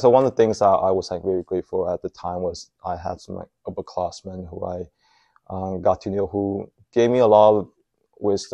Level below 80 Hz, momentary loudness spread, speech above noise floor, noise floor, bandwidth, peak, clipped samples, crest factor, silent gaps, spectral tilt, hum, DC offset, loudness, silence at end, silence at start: -54 dBFS; 18 LU; 35 dB; -56 dBFS; 9.4 kHz; -2 dBFS; under 0.1%; 20 dB; none; -6.5 dB/octave; none; under 0.1%; -22 LUFS; 0.05 s; 0 s